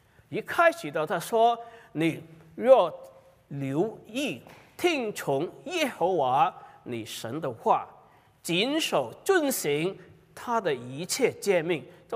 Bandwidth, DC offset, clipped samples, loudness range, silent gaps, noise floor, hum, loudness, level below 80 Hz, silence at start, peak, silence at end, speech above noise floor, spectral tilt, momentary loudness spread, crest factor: 16 kHz; under 0.1%; under 0.1%; 3 LU; none; -57 dBFS; none; -27 LUFS; -72 dBFS; 0.3 s; -6 dBFS; 0 s; 30 dB; -4 dB/octave; 15 LU; 22 dB